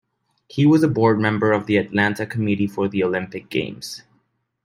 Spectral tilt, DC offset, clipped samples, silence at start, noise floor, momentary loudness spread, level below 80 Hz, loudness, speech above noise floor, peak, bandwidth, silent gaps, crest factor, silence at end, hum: -7 dB/octave; under 0.1%; under 0.1%; 0.55 s; -67 dBFS; 14 LU; -60 dBFS; -20 LUFS; 47 dB; -4 dBFS; 15.5 kHz; none; 16 dB; 0.65 s; none